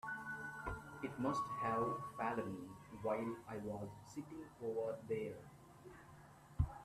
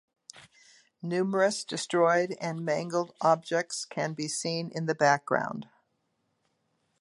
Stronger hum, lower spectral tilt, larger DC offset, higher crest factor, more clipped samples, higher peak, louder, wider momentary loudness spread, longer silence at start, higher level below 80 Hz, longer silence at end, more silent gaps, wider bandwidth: neither; first, -7 dB/octave vs -4.5 dB/octave; neither; about the same, 20 dB vs 22 dB; neither; second, -24 dBFS vs -8 dBFS; second, -44 LUFS vs -28 LUFS; first, 19 LU vs 9 LU; second, 0.05 s vs 0.35 s; first, -58 dBFS vs -78 dBFS; second, 0 s vs 1.35 s; neither; first, 14.5 kHz vs 11.5 kHz